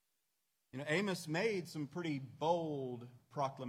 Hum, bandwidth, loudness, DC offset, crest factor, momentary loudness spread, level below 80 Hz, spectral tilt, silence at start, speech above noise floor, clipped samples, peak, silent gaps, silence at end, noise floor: none; 16 kHz; -39 LUFS; under 0.1%; 20 dB; 11 LU; -84 dBFS; -5.5 dB/octave; 0.75 s; 46 dB; under 0.1%; -20 dBFS; none; 0 s; -85 dBFS